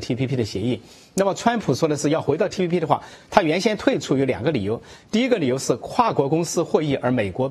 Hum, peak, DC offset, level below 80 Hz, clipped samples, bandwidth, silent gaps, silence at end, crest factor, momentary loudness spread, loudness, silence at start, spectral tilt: none; 0 dBFS; under 0.1%; -54 dBFS; under 0.1%; 13.5 kHz; none; 0 s; 20 dB; 5 LU; -22 LUFS; 0 s; -5.5 dB/octave